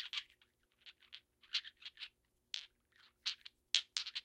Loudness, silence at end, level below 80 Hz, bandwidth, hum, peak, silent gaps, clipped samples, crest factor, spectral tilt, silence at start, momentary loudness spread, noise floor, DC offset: -42 LUFS; 0.05 s; -86 dBFS; 16 kHz; 60 Hz at -90 dBFS; -10 dBFS; none; under 0.1%; 38 dB; 4 dB/octave; 0 s; 24 LU; -75 dBFS; under 0.1%